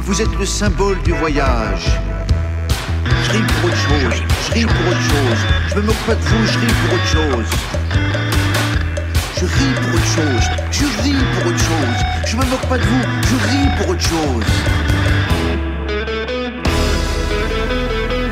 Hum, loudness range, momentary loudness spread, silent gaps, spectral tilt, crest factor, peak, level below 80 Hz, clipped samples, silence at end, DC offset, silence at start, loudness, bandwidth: none; 2 LU; 4 LU; none; -5 dB/octave; 12 dB; -2 dBFS; -22 dBFS; under 0.1%; 0 s; under 0.1%; 0 s; -16 LUFS; 16 kHz